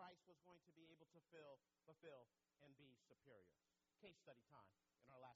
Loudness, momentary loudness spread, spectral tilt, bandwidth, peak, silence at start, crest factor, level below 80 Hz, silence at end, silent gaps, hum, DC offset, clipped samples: -67 LUFS; 4 LU; -3.5 dB/octave; 7.4 kHz; -50 dBFS; 0 s; 20 dB; under -90 dBFS; 0 s; none; none; under 0.1%; under 0.1%